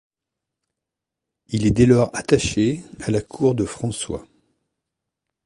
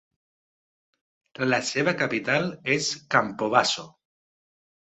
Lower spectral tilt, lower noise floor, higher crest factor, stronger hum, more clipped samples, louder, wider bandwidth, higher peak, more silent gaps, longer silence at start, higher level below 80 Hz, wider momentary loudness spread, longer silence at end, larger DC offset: first, -6 dB/octave vs -3.5 dB/octave; second, -85 dBFS vs under -90 dBFS; about the same, 20 dB vs 24 dB; neither; neither; first, -20 LUFS vs -24 LUFS; first, 11.5 kHz vs 8.6 kHz; about the same, -2 dBFS vs -4 dBFS; neither; about the same, 1.5 s vs 1.4 s; first, -42 dBFS vs -68 dBFS; first, 13 LU vs 4 LU; first, 1.25 s vs 1 s; neither